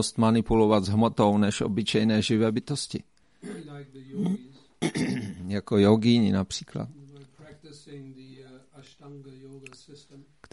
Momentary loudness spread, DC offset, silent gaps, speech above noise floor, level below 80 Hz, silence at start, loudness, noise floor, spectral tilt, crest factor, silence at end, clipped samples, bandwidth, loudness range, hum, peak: 24 LU; under 0.1%; none; 24 dB; -52 dBFS; 0 s; -25 LUFS; -50 dBFS; -6 dB/octave; 20 dB; 0.35 s; under 0.1%; 11.5 kHz; 20 LU; none; -8 dBFS